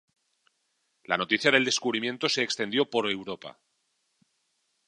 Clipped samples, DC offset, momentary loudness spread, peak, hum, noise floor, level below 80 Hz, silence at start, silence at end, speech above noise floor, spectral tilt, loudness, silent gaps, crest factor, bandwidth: under 0.1%; under 0.1%; 14 LU; -4 dBFS; none; -75 dBFS; -76 dBFS; 1.1 s; 1.4 s; 48 dB; -2.5 dB/octave; -26 LUFS; none; 26 dB; 10.5 kHz